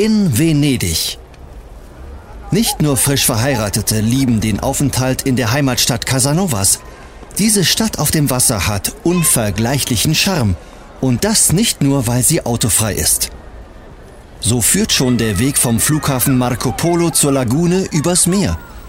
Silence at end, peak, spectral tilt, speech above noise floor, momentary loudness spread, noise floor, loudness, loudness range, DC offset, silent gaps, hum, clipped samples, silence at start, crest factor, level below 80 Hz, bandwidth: 0 s; -2 dBFS; -4 dB/octave; 22 dB; 6 LU; -36 dBFS; -14 LUFS; 2 LU; under 0.1%; none; none; under 0.1%; 0 s; 14 dB; -34 dBFS; 16.5 kHz